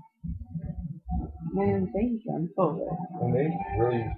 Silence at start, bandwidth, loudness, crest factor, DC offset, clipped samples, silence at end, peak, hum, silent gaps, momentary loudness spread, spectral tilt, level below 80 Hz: 0.25 s; 4.3 kHz; -30 LUFS; 18 dB; under 0.1%; under 0.1%; 0 s; -12 dBFS; none; none; 11 LU; -12.5 dB/octave; -42 dBFS